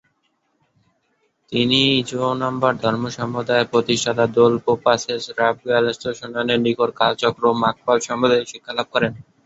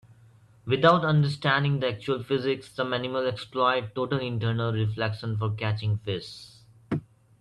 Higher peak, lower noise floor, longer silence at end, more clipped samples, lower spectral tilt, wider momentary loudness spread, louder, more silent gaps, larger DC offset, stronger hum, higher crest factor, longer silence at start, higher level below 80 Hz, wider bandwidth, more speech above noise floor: first, -2 dBFS vs -8 dBFS; first, -68 dBFS vs -56 dBFS; second, 0.25 s vs 0.4 s; neither; second, -4.5 dB/octave vs -7 dB/octave; second, 9 LU vs 12 LU; first, -19 LUFS vs -27 LUFS; neither; neither; neither; about the same, 18 dB vs 20 dB; first, 1.5 s vs 0.65 s; about the same, -58 dBFS vs -60 dBFS; second, 8 kHz vs 11 kHz; first, 49 dB vs 30 dB